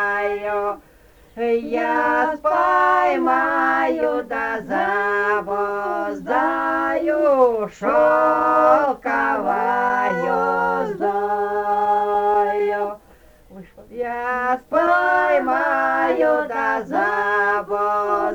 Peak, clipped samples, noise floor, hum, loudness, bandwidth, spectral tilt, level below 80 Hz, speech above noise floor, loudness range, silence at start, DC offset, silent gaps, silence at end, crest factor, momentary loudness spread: -2 dBFS; under 0.1%; -49 dBFS; none; -19 LUFS; over 20 kHz; -6 dB/octave; -54 dBFS; 30 dB; 4 LU; 0 s; under 0.1%; none; 0 s; 18 dB; 7 LU